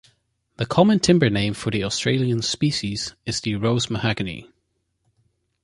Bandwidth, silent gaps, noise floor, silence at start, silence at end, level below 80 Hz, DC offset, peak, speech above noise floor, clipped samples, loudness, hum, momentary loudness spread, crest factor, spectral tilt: 11.5 kHz; none; -72 dBFS; 0.6 s; 1.2 s; -48 dBFS; under 0.1%; -2 dBFS; 51 dB; under 0.1%; -21 LUFS; none; 11 LU; 20 dB; -5 dB/octave